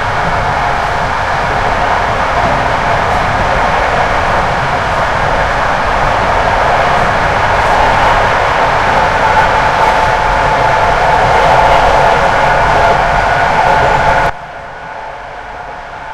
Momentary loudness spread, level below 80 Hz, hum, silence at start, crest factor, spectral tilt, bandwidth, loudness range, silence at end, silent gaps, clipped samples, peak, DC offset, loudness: 6 LU; -24 dBFS; none; 0 s; 10 dB; -4.5 dB/octave; 14.5 kHz; 3 LU; 0 s; none; under 0.1%; 0 dBFS; under 0.1%; -10 LUFS